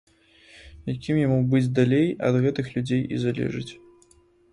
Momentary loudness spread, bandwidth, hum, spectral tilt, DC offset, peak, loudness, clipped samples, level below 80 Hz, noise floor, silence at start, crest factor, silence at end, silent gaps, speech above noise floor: 12 LU; 10.5 kHz; none; -8 dB/octave; under 0.1%; -6 dBFS; -24 LUFS; under 0.1%; -54 dBFS; -58 dBFS; 0.55 s; 18 dB; 0.75 s; none; 35 dB